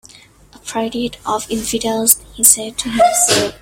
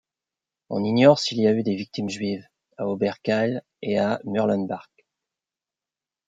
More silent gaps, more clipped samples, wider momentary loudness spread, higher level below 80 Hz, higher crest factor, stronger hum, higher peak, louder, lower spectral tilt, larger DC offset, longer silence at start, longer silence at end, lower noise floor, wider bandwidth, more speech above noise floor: neither; neither; about the same, 12 LU vs 14 LU; first, -44 dBFS vs -70 dBFS; second, 16 dB vs 22 dB; neither; first, 0 dBFS vs -4 dBFS; first, -14 LUFS vs -23 LUFS; second, -1.5 dB/octave vs -6 dB/octave; neither; about the same, 0.65 s vs 0.7 s; second, 0.05 s vs 1.45 s; second, -44 dBFS vs under -90 dBFS; first, 16.5 kHz vs 9 kHz; second, 28 dB vs over 67 dB